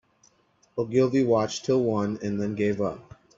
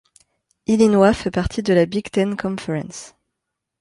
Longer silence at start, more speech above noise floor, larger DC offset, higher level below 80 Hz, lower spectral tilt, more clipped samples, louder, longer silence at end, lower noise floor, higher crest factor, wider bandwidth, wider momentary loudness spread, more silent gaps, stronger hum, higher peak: about the same, 0.75 s vs 0.7 s; second, 39 dB vs 62 dB; neither; second, -62 dBFS vs -42 dBFS; about the same, -6.5 dB/octave vs -6 dB/octave; neither; second, -25 LUFS vs -19 LUFS; second, 0.35 s vs 0.75 s; second, -64 dBFS vs -80 dBFS; about the same, 16 dB vs 18 dB; second, 7.8 kHz vs 11.5 kHz; second, 10 LU vs 15 LU; neither; neither; second, -10 dBFS vs -2 dBFS